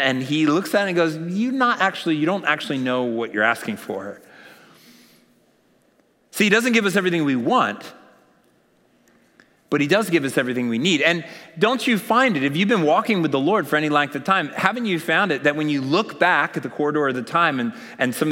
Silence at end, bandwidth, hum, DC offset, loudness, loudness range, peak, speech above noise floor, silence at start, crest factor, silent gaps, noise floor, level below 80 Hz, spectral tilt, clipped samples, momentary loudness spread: 0 s; 16.5 kHz; none; under 0.1%; -20 LUFS; 5 LU; -2 dBFS; 40 dB; 0 s; 18 dB; none; -61 dBFS; -76 dBFS; -5 dB/octave; under 0.1%; 7 LU